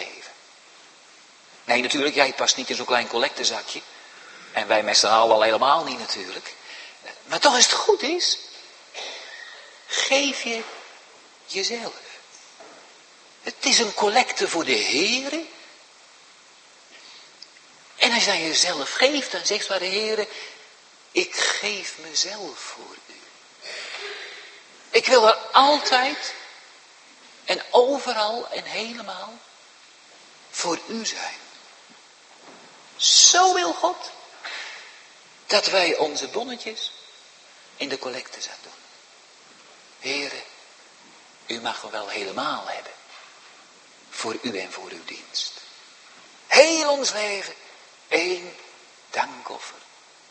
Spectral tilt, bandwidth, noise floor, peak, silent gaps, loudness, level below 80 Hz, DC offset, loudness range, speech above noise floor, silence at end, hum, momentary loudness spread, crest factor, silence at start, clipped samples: 0 dB/octave; 8.8 kHz; -51 dBFS; 0 dBFS; none; -21 LUFS; -78 dBFS; under 0.1%; 13 LU; 29 dB; 0.5 s; none; 23 LU; 26 dB; 0 s; under 0.1%